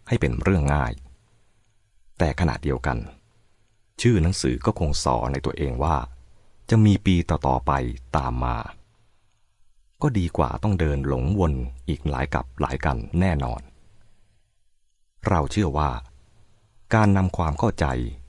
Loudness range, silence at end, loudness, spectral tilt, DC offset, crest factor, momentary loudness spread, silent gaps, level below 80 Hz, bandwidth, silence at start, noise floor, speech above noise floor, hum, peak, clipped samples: 5 LU; 0.05 s; -24 LUFS; -6.5 dB/octave; under 0.1%; 18 dB; 9 LU; none; -34 dBFS; 11.5 kHz; 0.05 s; -63 dBFS; 41 dB; none; -6 dBFS; under 0.1%